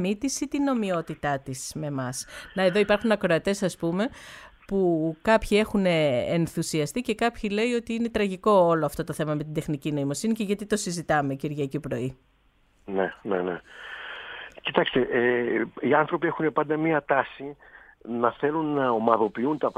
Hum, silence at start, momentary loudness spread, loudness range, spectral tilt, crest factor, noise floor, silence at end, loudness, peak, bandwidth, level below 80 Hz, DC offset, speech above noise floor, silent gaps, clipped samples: none; 0 s; 11 LU; 4 LU; -5.5 dB/octave; 24 dB; -63 dBFS; 0.05 s; -26 LUFS; -2 dBFS; 16 kHz; -52 dBFS; under 0.1%; 38 dB; none; under 0.1%